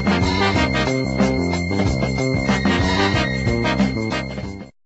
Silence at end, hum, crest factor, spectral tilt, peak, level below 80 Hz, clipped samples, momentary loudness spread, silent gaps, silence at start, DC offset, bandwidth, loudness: 0.15 s; none; 16 dB; -5.5 dB/octave; -4 dBFS; -32 dBFS; under 0.1%; 6 LU; none; 0 s; under 0.1%; 8.2 kHz; -19 LUFS